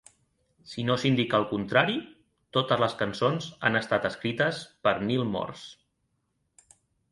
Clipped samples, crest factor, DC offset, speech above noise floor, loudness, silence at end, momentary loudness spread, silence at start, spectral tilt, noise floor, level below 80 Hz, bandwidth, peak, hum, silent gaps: under 0.1%; 22 dB; under 0.1%; 49 dB; -27 LUFS; 1.4 s; 9 LU; 0.65 s; -5.5 dB/octave; -76 dBFS; -62 dBFS; 11.5 kHz; -6 dBFS; none; none